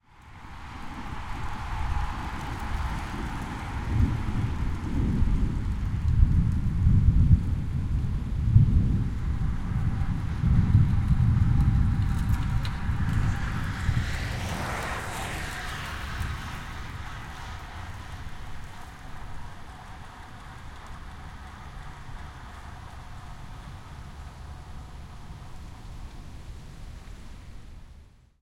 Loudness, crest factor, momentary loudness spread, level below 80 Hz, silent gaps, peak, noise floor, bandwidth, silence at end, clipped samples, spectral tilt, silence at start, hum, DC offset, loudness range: -28 LUFS; 22 dB; 21 LU; -32 dBFS; none; -4 dBFS; -51 dBFS; 15.5 kHz; 0.4 s; under 0.1%; -7 dB/octave; 0.2 s; none; under 0.1%; 19 LU